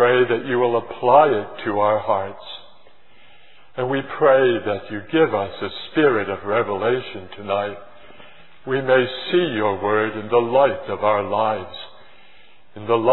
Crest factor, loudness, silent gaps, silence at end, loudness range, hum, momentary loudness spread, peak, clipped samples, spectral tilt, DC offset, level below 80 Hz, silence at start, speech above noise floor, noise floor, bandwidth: 20 dB; -20 LUFS; none; 0 s; 3 LU; none; 18 LU; 0 dBFS; under 0.1%; -9.5 dB/octave; 0.9%; -62 dBFS; 0 s; 34 dB; -53 dBFS; 4.2 kHz